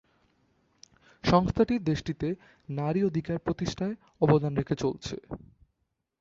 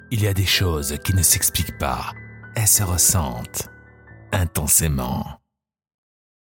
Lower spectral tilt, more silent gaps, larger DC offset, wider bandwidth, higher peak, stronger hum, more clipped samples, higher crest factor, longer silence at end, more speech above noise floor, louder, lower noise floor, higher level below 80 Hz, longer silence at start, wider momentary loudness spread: first, -7 dB/octave vs -3 dB/octave; neither; neither; second, 7.6 kHz vs 17 kHz; second, -8 dBFS vs -2 dBFS; neither; neither; about the same, 22 dB vs 20 dB; second, 0.85 s vs 1.2 s; first, 51 dB vs 25 dB; second, -29 LUFS vs -19 LUFS; first, -79 dBFS vs -45 dBFS; second, -50 dBFS vs -38 dBFS; first, 1.25 s vs 0.1 s; about the same, 14 LU vs 14 LU